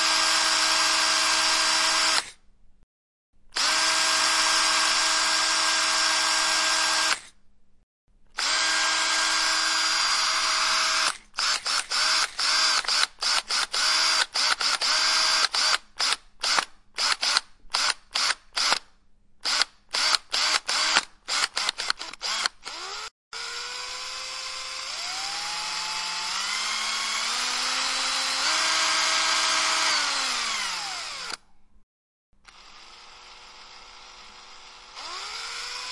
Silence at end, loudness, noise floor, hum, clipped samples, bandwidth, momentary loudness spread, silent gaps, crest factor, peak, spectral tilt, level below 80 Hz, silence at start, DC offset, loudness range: 0 s; -23 LUFS; -55 dBFS; none; under 0.1%; 11.5 kHz; 12 LU; 2.83-3.33 s, 7.83-8.08 s, 23.11-23.31 s, 31.83-32.33 s; 24 dB; -2 dBFS; 2.5 dB/octave; -60 dBFS; 0 s; under 0.1%; 9 LU